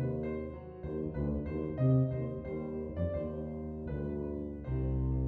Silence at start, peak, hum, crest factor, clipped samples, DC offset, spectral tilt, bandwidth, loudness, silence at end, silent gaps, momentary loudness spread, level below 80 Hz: 0 s; -18 dBFS; none; 18 dB; under 0.1%; under 0.1%; -12 dB/octave; 3.7 kHz; -36 LUFS; 0 s; none; 11 LU; -44 dBFS